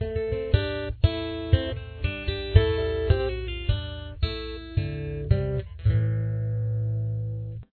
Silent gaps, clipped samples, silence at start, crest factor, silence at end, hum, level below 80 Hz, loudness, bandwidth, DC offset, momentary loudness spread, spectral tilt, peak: none; under 0.1%; 0 s; 22 dB; 0.1 s; none; -32 dBFS; -27 LUFS; 4.5 kHz; under 0.1%; 8 LU; -10 dB/octave; -4 dBFS